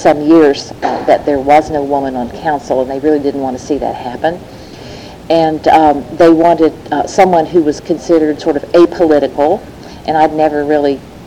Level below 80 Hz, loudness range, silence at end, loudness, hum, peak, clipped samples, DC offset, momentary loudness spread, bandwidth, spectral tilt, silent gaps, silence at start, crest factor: -40 dBFS; 6 LU; 0 s; -12 LUFS; none; 0 dBFS; under 0.1%; under 0.1%; 11 LU; 11.5 kHz; -6 dB/octave; none; 0 s; 12 dB